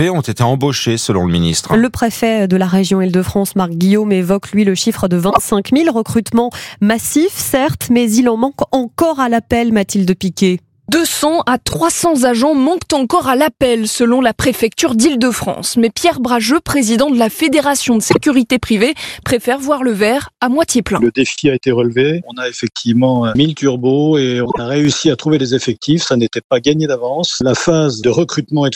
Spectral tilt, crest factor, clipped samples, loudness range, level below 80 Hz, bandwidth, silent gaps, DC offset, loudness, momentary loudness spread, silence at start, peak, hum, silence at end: -5 dB/octave; 14 dB; under 0.1%; 1 LU; -44 dBFS; 17 kHz; 26.44-26.50 s; under 0.1%; -14 LUFS; 4 LU; 0 s; 0 dBFS; none; 0 s